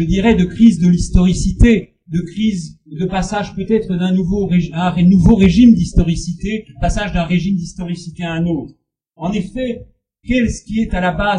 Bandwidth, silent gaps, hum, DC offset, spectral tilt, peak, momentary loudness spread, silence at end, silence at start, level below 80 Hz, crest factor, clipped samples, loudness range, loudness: 10 kHz; none; none; under 0.1%; -7 dB/octave; 0 dBFS; 14 LU; 0 s; 0 s; -24 dBFS; 14 dB; under 0.1%; 8 LU; -15 LUFS